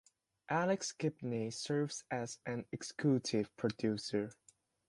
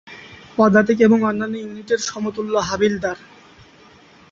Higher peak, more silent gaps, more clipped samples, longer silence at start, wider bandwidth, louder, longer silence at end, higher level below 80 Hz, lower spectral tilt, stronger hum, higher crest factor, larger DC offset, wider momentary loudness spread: second, -20 dBFS vs -2 dBFS; neither; neither; first, 0.5 s vs 0.05 s; first, 11.5 kHz vs 7.6 kHz; second, -38 LUFS vs -19 LUFS; second, 0.55 s vs 1.15 s; second, -74 dBFS vs -54 dBFS; about the same, -5 dB/octave vs -5 dB/octave; neither; about the same, 18 dB vs 18 dB; neither; second, 8 LU vs 15 LU